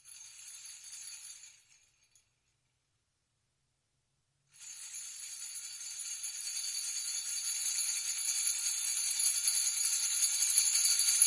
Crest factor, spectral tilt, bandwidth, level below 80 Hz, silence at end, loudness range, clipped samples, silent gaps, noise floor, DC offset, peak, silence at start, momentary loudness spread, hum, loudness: 26 dB; 6 dB/octave; 12 kHz; -90 dBFS; 0 s; 22 LU; under 0.1%; none; -80 dBFS; under 0.1%; -10 dBFS; 0.05 s; 21 LU; none; -30 LUFS